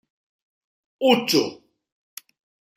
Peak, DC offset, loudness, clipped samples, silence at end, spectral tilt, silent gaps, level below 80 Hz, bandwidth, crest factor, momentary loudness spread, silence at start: -4 dBFS; under 0.1%; -21 LUFS; under 0.1%; 1.2 s; -3.5 dB/octave; none; -72 dBFS; 16 kHz; 22 dB; 24 LU; 1 s